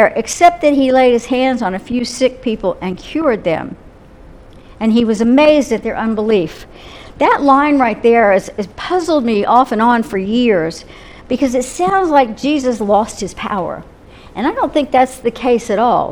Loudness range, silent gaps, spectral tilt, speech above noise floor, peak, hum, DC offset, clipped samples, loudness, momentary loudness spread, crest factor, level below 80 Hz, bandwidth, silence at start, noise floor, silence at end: 4 LU; none; -5 dB/octave; 25 dB; 0 dBFS; none; under 0.1%; under 0.1%; -14 LUFS; 12 LU; 14 dB; -42 dBFS; 14 kHz; 0 s; -38 dBFS; 0 s